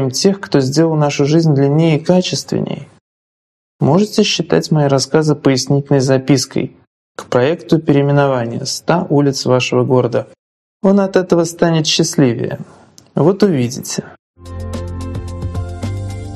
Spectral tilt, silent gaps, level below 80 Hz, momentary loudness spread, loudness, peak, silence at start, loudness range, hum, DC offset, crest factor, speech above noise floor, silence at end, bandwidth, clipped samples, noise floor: -5.5 dB/octave; 3.01-3.79 s, 6.87-7.15 s, 10.39-10.80 s, 14.19-14.34 s; -42 dBFS; 12 LU; -14 LUFS; 0 dBFS; 0 s; 3 LU; none; under 0.1%; 14 dB; over 77 dB; 0 s; 13.5 kHz; under 0.1%; under -90 dBFS